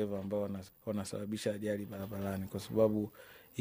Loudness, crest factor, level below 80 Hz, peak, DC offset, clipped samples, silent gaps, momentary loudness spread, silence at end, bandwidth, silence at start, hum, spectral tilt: -37 LUFS; 20 dB; -68 dBFS; -16 dBFS; under 0.1%; under 0.1%; none; 12 LU; 0 s; 15.5 kHz; 0 s; none; -6.5 dB/octave